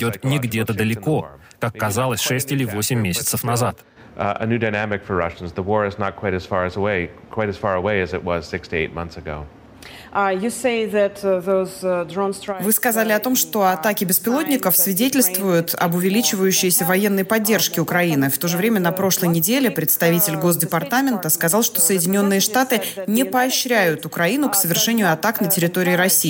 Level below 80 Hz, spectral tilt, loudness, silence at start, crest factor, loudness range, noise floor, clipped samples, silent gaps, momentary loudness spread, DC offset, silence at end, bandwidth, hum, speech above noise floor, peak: -50 dBFS; -4 dB/octave; -19 LUFS; 0 s; 16 dB; 6 LU; -40 dBFS; under 0.1%; none; 9 LU; under 0.1%; 0 s; 17 kHz; none; 21 dB; -4 dBFS